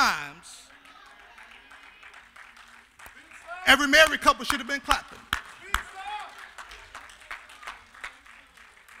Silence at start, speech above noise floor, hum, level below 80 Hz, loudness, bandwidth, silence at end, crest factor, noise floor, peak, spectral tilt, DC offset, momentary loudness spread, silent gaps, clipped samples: 0 s; 31 dB; none; -48 dBFS; -23 LUFS; 16 kHz; 0.9 s; 26 dB; -53 dBFS; -4 dBFS; -1.5 dB/octave; under 0.1%; 29 LU; none; under 0.1%